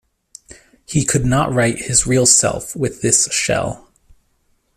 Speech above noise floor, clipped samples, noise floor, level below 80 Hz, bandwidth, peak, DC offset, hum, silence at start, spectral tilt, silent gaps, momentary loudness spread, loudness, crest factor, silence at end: 46 dB; under 0.1%; -62 dBFS; -40 dBFS; 15 kHz; 0 dBFS; under 0.1%; none; 0.9 s; -3.5 dB/octave; none; 11 LU; -15 LUFS; 18 dB; 1 s